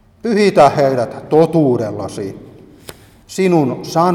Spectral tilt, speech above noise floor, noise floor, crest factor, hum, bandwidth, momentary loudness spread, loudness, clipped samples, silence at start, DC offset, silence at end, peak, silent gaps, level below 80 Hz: -6.5 dB/octave; 25 dB; -39 dBFS; 14 dB; none; 15.5 kHz; 15 LU; -14 LUFS; under 0.1%; 0.25 s; under 0.1%; 0 s; 0 dBFS; none; -52 dBFS